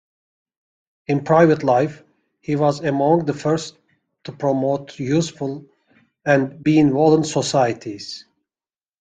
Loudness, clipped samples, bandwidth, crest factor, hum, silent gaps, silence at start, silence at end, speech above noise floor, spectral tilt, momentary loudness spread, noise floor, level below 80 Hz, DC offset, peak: -19 LUFS; under 0.1%; 9.4 kHz; 18 dB; none; none; 1.1 s; 0.8 s; over 72 dB; -6 dB/octave; 19 LU; under -90 dBFS; -58 dBFS; under 0.1%; -2 dBFS